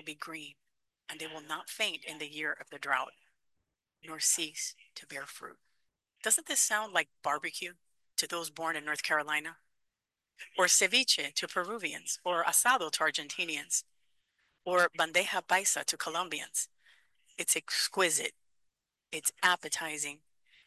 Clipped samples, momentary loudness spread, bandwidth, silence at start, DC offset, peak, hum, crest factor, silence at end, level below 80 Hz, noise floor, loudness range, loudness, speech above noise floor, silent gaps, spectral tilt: under 0.1%; 17 LU; 13 kHz; 0.05 s; under 0.1%; -12 dBFS; none; 22 dB; 0.5 s; -88 dBFS; -87 dBFS; 7 LU; -31 LUFS; 54 dB; none; 0.5 dB/octave